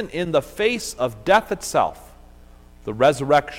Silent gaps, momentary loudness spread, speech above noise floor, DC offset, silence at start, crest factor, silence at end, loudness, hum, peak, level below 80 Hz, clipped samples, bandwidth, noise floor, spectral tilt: none; 8 LU; 25 dB; under 0.1%; 0 s; 18 dB; 0 s; -21 LUFS; 60 Hz at -50 dBFS; -4 dBFS; -46 dBFS; under 0.1%; 17 kHz; -46 dBFS; -4 dB/octave